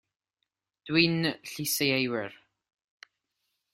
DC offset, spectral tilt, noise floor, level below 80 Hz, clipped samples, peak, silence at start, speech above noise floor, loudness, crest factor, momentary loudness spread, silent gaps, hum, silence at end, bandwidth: under 0.1%; -4 dB/octave; -84 dBFS; -68 dBFS; under 0.1%; -8 dBFS; 0.85 s; 56 dB; -27 LUFS; 24 dB; 10 LU; none; none; 1.4 s; 16 kHz